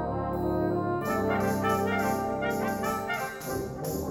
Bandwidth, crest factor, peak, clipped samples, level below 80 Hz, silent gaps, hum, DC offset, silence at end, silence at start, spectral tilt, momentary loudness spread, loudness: over 20 kHz; 14 dB; -14 dBFS; under 0.1%; -48 dBFS; none; none; under 0.1%; 0 s; 0 s; -6 dB/octave; 6 LU; -29 LUFS